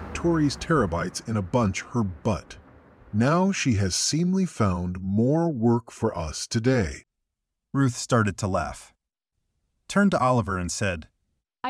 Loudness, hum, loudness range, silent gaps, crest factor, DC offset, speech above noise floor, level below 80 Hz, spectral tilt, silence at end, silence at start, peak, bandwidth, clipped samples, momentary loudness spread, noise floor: -25 LUFS; none; 3 LU; none; 18 dB; under 0.1%; 58 dB; -46 dBFS; -5.5 dB/octave; 0 s; 0 s; -8 dBFS; 13 kHz; under 0.1%; 7 LU; -82 dBFS